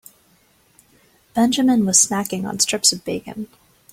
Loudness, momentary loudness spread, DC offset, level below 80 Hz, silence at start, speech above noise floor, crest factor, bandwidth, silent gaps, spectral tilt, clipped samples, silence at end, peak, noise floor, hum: -18 LUFS; 17 LU; under 0.1%; -58 dBFS; 1.35 s; 39 dB; 20 dB; 16.5 kHz; none; -2.5 dB/octave; under 0.1%; 0.45 s; -2 dBFS; -58 dBFS; none